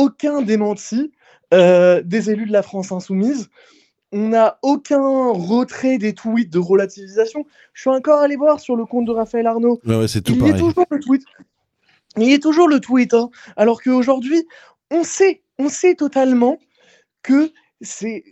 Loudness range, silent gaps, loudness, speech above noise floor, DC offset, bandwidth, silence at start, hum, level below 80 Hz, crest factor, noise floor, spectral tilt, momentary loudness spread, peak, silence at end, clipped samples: 2 LU; none; -17 LUFS; 45 dB; under 0.1%; 13 kHz; 0 s; none; -54 dBFS; 16 dB; -61 dBFS; -6 dB/octave; 12 LU; 0 dBFS; 0.1 s; under 0.1%